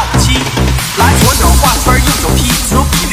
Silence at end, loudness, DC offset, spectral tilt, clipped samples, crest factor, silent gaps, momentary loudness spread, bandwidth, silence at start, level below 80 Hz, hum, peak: 0 s; -9 LUFS; under 0.1%; -3.5 dB/octave; 0.5%; 10 dB; none; 4 LU; 16 kHz; 0 s; -14 dBFS; none; 0 dBFS